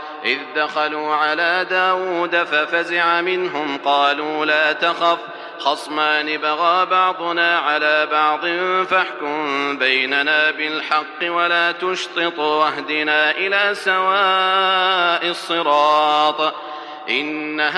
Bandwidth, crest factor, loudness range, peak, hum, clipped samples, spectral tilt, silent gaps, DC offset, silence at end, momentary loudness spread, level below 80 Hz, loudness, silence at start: 12.5 kHz; 16 dB; 2 LU; -2 dBFS; none; under 0.1%; -3 dB/octave; none; under 0.1%; 0 s; 6 LU; -82 dBFS; -17 LUFS; 0 s